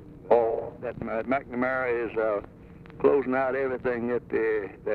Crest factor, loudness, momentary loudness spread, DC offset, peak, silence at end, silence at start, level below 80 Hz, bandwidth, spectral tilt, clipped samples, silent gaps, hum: 20 dB; -27 LUFS; 9 LU; under 0.1%; -8 dBFS; 0 s; 0 s; -54 dBFS; 4.7 kHz; -9 dB/octave; under 0.1%; none; none